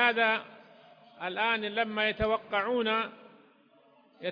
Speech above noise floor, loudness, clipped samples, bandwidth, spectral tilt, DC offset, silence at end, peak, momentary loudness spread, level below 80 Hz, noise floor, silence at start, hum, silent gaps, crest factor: 33 dB; -29 LUFS; under 0.1%; 5.2 kHz; -6.5 dB/octave; under 0.1%; 0 s; -10 dBFS; 11 LU; -56 dBFS; -62 dBFS; 0 s; none; none; 20 dB